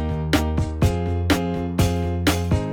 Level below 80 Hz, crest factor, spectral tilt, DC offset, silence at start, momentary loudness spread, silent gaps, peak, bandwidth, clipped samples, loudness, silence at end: -32 dBFS; 16 dB; -6 dB/octave; under 0.1%; 0 s; 2 LU; none; -4 dBFS; 18.5 kHz; under 0.1%; -22 LUFS; 0 s